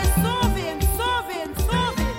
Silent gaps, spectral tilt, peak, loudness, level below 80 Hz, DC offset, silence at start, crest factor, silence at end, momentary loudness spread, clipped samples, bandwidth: none; -4.5 dB/octave; -8 dBFS; -23 LUFS; -26 dBFS; under 0.1%; 0 s; 14 dB; 0 s; 5 LU; under 0.1%; 17 kHz